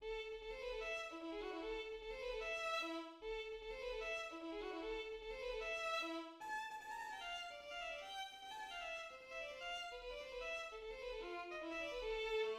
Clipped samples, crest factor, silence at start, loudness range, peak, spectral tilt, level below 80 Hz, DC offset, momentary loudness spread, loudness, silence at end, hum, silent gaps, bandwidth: under 0.1%; 16 dB; 0 s; 3 LU; -30 dBFS; -2.5 dB/octave; -64 dBFS; under 0.1%; 7 LU; -46 LUFS; 0 s; none; none; 15.5 kHz